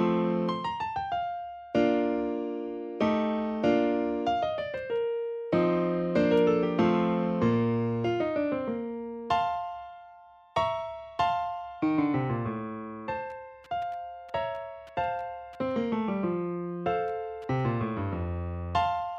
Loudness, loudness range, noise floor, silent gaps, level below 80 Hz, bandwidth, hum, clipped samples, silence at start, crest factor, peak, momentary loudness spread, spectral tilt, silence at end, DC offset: -29 LUFS; 6 LU; -53 dBFS; none; -54 dBFS; 7.4 kHz; none; under 0.1%; 0 s; 18 dB; -12 dBFS; 11 LU; -8 dB/octave; 0 s; under 0.1%